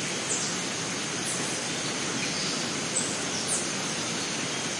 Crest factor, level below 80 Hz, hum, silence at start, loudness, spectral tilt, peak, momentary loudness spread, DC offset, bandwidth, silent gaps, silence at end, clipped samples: 14 dB; -66 dBFS; none; 0 s; -28 LUFS; -1.5 dB/octave; -16 dBFS; 2 LU; under 0.1%; 11.5 kHz; none; 0 s; under 0.1%